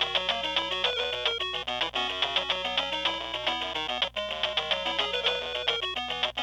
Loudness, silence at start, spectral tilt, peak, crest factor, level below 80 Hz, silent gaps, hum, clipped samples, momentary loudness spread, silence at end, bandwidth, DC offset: -28 LUFS; 0 s; -2 dB/octave; -14 dBFS; 16 dB; -54 dBFS; none; 60 Hz at -55 dBFS; under 0.1%; 3 LU; 0 s; 19 kHz; under 0.1%